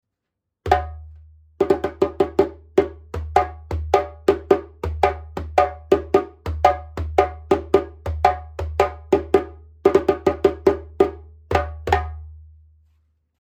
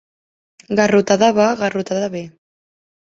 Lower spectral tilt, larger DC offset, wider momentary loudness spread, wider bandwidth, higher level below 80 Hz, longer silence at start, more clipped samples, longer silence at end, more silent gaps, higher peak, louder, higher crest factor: first, -7 dB/octave vs -5 dB/octave; neither; about the same, 11 LU vs 13 LU; first, 13.5 kHz vs 7.8 kHz; first, -36 dBFS vs -58 dBFS; about the same, 0.65 s vs 0.7 s; neither; first, 0.95 s vs 0.8 s; neither; about the same, 0 dBFS vs -2 dBFS; second, -21 LUFS vs -16 LUFS; about the same, 20 dB vs 18 dB